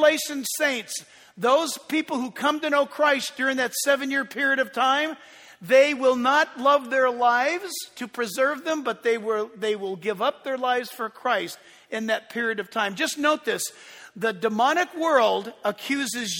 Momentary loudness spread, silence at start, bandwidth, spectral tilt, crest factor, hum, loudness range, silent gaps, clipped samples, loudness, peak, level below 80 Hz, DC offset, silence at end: 10 LU; 0 s; 19.5 kHz; -2.5 dB/octave; 20 dB; none; 5 LU; none; under 0.1%; -24 LUFS; -6 dBFS; -76 dBFS; under 0.1%; 0 s